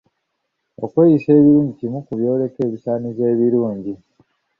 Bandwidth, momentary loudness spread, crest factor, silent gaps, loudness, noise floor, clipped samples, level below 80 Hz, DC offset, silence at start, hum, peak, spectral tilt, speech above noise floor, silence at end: 5 kHz; 16 LU; 16 dB; none; -17 LUFS; -74 dBFS; under 0.1%; -56 dBFS; under 0.1%; 0.8 s; none; -2 dBFS; -12 dB/octave; 58 dB; 0.65 s